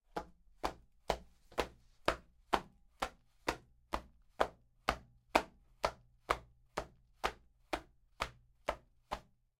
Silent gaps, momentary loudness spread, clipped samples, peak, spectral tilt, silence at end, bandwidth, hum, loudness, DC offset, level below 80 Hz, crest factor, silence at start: none; 10 LU; under 0.1%; -10 dBFS; -3.5 dB/octave; 0.4 s; 16.5 kHz; none; -41 LUFS; under 0.1%; -56 dBFS; 32 dB; 0.15 s